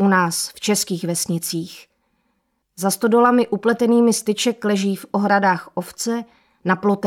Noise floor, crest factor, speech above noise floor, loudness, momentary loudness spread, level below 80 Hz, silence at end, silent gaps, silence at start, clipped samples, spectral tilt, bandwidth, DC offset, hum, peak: -70 dBFS; 16 dB; 51 dB; -19 LUFS; 10 LU; -66 dBFS; 0 s; none; 0 s; under 0.1%; -4.5 dB/octave; 17 kHz; under 0.1%; none; -4 dBFS